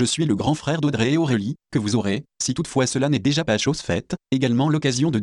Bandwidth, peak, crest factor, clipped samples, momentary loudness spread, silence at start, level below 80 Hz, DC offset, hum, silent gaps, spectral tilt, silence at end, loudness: 11.5 kHz; -8 dBFS; 12 dB; under 0.1%; 6 LU; 0 s; -50 dBFS; under 0.1%; none; none; -5 dB/octave; 0 s; -22 LUFS